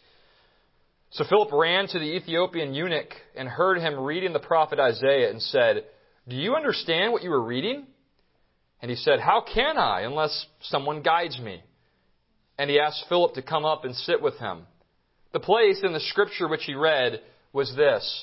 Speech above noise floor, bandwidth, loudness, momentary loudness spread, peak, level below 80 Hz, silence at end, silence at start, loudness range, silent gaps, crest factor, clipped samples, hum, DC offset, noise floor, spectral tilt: 43 dB; 5.8 kHz; -24 LUFS; 13 LU; -6 dBFS; -58 dBFS; 0 s; 1.15 s; 3 LU; none; 20 dB; under 0.1%; none; under 0.1%; -68 dBFS; -8.5 dB/octave